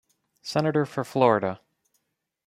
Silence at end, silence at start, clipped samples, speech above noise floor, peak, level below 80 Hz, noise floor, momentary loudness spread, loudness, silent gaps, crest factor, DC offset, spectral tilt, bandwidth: 0.9 s; 0.45 s; under 0.1%; 52 dB; -6 dBFS; -68 dBFS; -76 dBFS; 16 LU; -25 LUFS; none; 22 dB; under 0.1%; -6.5 dB/octave; 15 kHz